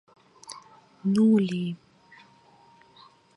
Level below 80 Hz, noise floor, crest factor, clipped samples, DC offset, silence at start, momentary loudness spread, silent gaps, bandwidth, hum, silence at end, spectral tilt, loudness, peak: -76 dBFS; -57 dBFS; 16 dB; under 0.1%; under 0.1%; 0.5 s; 24 LU; none; 11.5 kHz; none; 1.6 s; -7.5 dB/octave; -24 LUFS; -12 dBFS